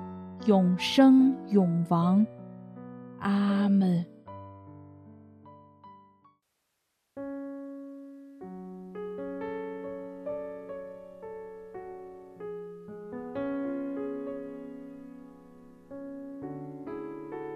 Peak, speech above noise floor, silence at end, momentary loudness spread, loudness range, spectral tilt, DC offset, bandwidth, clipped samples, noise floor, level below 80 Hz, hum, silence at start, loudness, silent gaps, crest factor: -8 dBFS; 56 dB; 0 s; 22 LU; 20 LU; -7.5 dB/octave; under 0.1%; 10.5 kHz; under 0.1%; -79 dBFS; -70 dBFS; none; 0 s; -28 LUFS; none; 22 dB